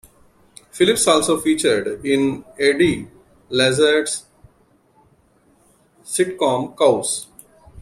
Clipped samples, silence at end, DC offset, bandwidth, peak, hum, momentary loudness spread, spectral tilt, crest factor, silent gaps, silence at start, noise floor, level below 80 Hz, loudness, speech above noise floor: under 0.1%; 0 s; under 0.1%; 15 kHz; -2 dBFS; none; 11 LU; -3.5 dB/octave; 18 dB; none; 0.75 s; -57 dBFS; -54 dBFS; -18 LUFS; 40 dB